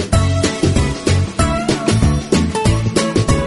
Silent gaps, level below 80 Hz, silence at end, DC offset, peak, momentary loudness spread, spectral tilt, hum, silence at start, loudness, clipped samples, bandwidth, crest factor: none; -24 dBFS; 0 s; under 0.1%; 0 dBFS; 2 LU; -5.5 dB/octave; none; 0 s; -16 LUFS; under 0.1%; 11.5 kHz; 14 dB